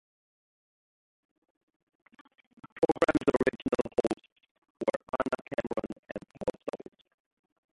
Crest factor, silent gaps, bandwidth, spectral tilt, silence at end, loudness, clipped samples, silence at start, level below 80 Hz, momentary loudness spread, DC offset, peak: 24 dB; 2.72-2.76 s, 4.32-4.36 s, 4.51-4.62 s, 4.70-4.75 s, 4.96-5.00 s, 5.99-6.03 s; 11.5 kHz; -6.5 dB/octave; 1 s; -32 LUFS; under 0.1%; 2.65 s; -60 dBFS; 16 LU; under 0.1%; -10 dBFS